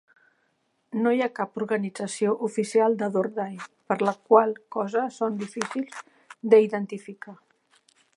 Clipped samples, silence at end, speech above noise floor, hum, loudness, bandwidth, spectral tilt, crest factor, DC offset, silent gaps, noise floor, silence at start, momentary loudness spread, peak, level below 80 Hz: under 0.1%; 0.85 s; 47 dB; none; -25 LUFS; 11.5 kHz; -5.5 dB/octave; 22 dB; under 0.1%; none; -72 dBFS; 0.95 s; 17 LU; -4 dBFS; -82 dBFS